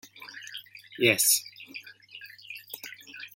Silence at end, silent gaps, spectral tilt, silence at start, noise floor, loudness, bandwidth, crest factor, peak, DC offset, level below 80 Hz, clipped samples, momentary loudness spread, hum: 0.1 s; none; -1.5 dB/octave; 0.2 s; -49 dBFS; -23 LUFS; 17 kHz; 26 dB; -6 dBFS; under 0.1%; -76 dBFS; under 0.1%; 24 LU; none